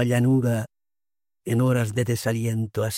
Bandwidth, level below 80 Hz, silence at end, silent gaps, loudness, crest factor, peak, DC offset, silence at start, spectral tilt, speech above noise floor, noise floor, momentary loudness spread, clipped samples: 16.5 kHz; -60 dBFS; 0 s; none; -24 LUFS; 16 dB; -8 dBFS; under 0.1%; 0 s; -6.5 dB/octave; over 68 dB; under -90 dBFS; 8 LU; under 0.1%